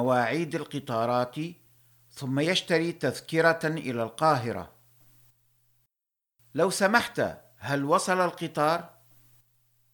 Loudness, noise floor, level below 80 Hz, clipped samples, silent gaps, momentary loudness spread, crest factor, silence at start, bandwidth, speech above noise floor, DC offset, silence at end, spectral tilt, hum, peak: -27 LUFS; -88 dBFS; -68 dBFS; under 0.1%; none; 12 LU; 22 dB; 0 s; 19 kHz; 61 dB; under 0.1%; 1.05 s; -4.5 dB/octave; none; -8 dBFS